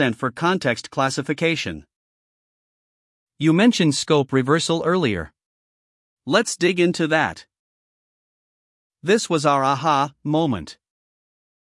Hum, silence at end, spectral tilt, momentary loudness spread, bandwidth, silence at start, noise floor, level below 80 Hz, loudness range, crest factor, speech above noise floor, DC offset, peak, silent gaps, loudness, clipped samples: none; 0.9 s; -5 dB/octave; 12 LU; 12 kHz; 0 s; under -90 dBFS; -60 dBFS; 3 LU; 20 dB; over 70 dB; under 0.1%; -2 dBFS; 1.96-3.27 s, 5.46-6.17 s, 7.59-8.90 s; -20 LUFS; under 0.1%